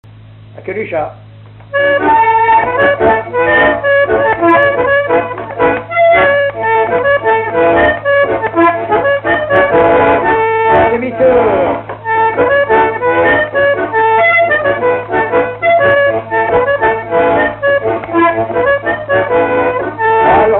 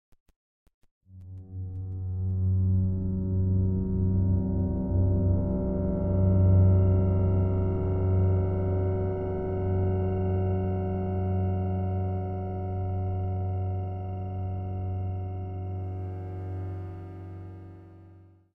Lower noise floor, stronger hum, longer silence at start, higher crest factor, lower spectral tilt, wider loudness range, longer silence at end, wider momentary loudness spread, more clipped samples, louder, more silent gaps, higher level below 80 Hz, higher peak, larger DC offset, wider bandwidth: second, -35 dBFS vs -53 dBFS; neither; second, 0.35 s vs 1.1 s; about the same, 10 dB vs 14 dB; second, -8.5 dB/octave vs -13 dB/octave; second, 2 LU vs 10 LU; second, 0 s vs 0.35 s; second, 5 LU vs 12 LU; neither; first, -11 LUFS vs -28 LUFS; neither; about the same, -40 dBFS vs -40 dBFS; first, 0 dBFS vs -12 dBFS; first, 0.1% vs under 0.1%; first, 4.2 kHz vs 2.9 kHz